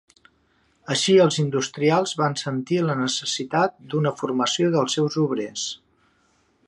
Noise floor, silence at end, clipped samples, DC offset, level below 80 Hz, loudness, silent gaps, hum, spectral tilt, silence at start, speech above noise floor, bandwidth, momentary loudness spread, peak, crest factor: -64 dBFS; 0.9 s; under 0.1%; under 0.1%; -68 dBFS; -22 LUFS; none; none; -4.5 dB/octave; 0.9 s; 42 dB; 11.5 kHz; 9 LU; -6 dBFS; 18 dB